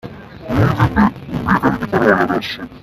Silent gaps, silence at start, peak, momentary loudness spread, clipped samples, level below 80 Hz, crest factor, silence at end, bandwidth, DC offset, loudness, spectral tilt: none; 0.05 s; 0 dBFS; 11 LU; under 0.1%; -36 dBFS; 16 dB; 0.05 s; 14 kHz; under 0.1%; -16 LUFS; -7.5 dB/octave